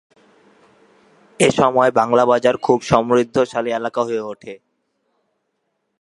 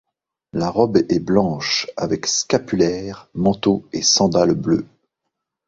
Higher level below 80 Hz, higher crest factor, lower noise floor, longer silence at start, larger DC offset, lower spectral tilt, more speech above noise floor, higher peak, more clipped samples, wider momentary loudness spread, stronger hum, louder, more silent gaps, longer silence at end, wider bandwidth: second, -56 dBFS vs -48 dBFS; about the same, 18 dB vs 18 dB; second, -72 dBFS vs -79 dBFS; first, 1.4 s vs 0.55 s; neither; about the same, -5 dB/octave vs -4 dB/octave; second, 55 dB vs 61 dB; about the same, 0 dBFS vs 0 dBFS; neither; about the same, 10 LU vs 8 LU; neither; about the same, -17 LUFS vs -18 LUFS; neither; first, 1.45 s vs 0.85 s; first, 11.5 kHz vs 7.8 kHz